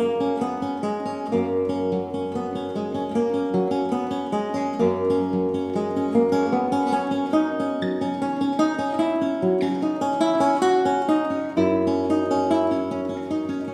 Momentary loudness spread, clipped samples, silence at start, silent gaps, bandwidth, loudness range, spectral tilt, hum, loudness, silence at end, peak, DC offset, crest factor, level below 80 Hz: 7 LU; under 0.1%; 0 s; none; 11.5 kHz; 4 LU; -6.5 dB/octave; none; -23 LUFS; 0 s; -8 dBFS; under 0.1%; 16 dB; -64 dBFS